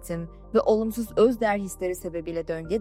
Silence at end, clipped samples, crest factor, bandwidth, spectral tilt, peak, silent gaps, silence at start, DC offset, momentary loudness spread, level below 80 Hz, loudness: 0 s; under 0.1%; 16 dB; 16 kHz; -6 dB/octave; -8 dBFS; none; 0 s; under 0.1%; 11 LU; -46 dBFS; -26 LUFS